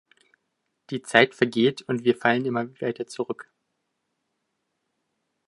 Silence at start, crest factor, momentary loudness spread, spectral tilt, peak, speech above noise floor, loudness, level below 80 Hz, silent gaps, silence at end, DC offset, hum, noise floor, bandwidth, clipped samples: 0.9 s; 26 dB; 14 LU; -5 dB/octave; 0 dBFS; 54 dB; -24 LUFS; -74 dBFS; none; 2.05 s; under 0.1%; none; -78 dBFS; 11.5 kHz; under 0.1%